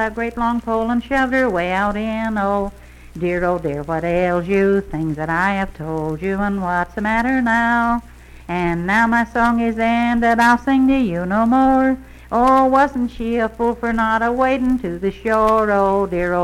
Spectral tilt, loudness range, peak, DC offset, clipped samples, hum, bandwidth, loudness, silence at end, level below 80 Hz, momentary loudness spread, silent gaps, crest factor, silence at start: -7 dB/octave; 4 LU; -4 dBFS; under 0.1%; under 0.1%; none; 13.5 kHz; -18 LUFS; 0 s; -38 dBFS; 9 LU; none; 14 dB; 0 s